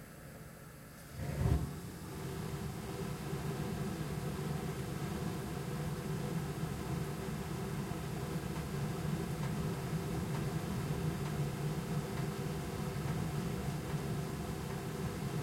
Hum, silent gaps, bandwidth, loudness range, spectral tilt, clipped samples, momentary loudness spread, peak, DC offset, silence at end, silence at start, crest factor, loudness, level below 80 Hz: none; none; 16.5 kHz; 2 LU; -6 dB/octave; under 0.1%; 5 LU; -20 dBFS; under 0.1%; 0 s; 0 s; 18 dB; -39 LUFS; -50 dBFS